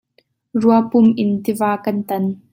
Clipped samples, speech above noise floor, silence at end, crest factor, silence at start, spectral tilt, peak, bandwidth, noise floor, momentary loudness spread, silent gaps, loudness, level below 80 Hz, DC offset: under 0.1%; 45 dB; 0.15 s; 16 dB; 0.55 s; -7.5 dB/octave; -2 dBFS; 16.5 kHz; -61 dBFS; 8 LU; none; -17 LUFS; -60 dBFS; under 0.1%